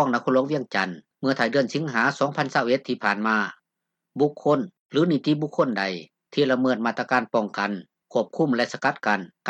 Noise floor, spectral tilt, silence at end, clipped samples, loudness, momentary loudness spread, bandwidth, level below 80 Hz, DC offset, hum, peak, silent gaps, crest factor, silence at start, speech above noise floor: -83 dBFS; -6 dB/octave; 0 s; under 0.1%; -24 LUFS; 7 LU; 8.6 kHz; -76 dBFS; under 0.1%; none; -6 dBFS; 4.80-4.89 s; 18 dB; 0 s; 60 dB